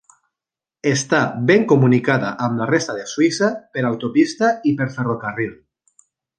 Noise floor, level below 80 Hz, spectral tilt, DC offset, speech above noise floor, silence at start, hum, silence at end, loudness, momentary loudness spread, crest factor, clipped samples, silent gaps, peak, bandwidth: -88 dBFS; -62 dBFS; -5.5 dB/octave; under 0.1%; 70 dB; 0.85 s; none; 0.85 s; -18 LUFS; 9 LU; 18 dB; under 0.1%; none; -2 dBFS; 10 kHz